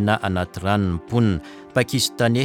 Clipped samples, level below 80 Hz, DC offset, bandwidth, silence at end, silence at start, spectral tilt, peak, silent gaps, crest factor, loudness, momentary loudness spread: under 0.1%; -44 dBFS; under 0.1%; 17 kHz; 0 s; 0 s; -5 dB/octave; -4 dBFS; none; 16 dB; -22 LUFS; 5 LU